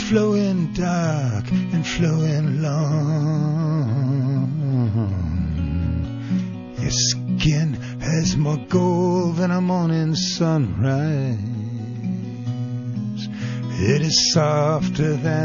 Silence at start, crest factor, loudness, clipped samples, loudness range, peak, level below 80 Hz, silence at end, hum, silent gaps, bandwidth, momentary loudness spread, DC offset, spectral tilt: 0 s; 16 dB; -21 LUFS; under 0.1%; 3 LU; -4 dBFS; -40 dBFS; 0 s; none; none; 7.4 kHz; 9 LU; 0.2%; -5.5 dB/octave